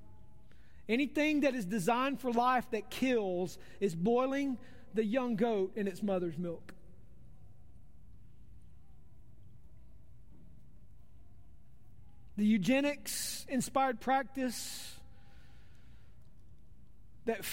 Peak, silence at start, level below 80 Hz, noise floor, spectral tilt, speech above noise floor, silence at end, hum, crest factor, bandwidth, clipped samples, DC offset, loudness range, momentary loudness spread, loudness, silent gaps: -18 dBFS; 0.9 s; -62 dBFS; -60 dBFS; -5 dB/octave; 27 dB; 0 s; none; 18 dB; 16 kHz; under 0.1%; 0.4%; 10 LU; 11 LU; -34 LUFS; none